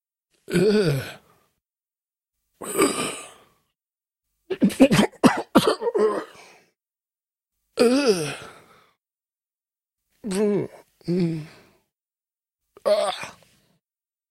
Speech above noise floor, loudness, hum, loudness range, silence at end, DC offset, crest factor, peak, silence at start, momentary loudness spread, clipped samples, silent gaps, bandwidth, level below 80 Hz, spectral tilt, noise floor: over 68 dB; -22 LUFS; none; 8 LU; 1 s; under 0.1%; 24 dB; -2 dBFS; 0.5 s; 19 LU; under 0.1%; none; 16 kHz; -58 dBFS; -5 dB/octave; under -90 dBFS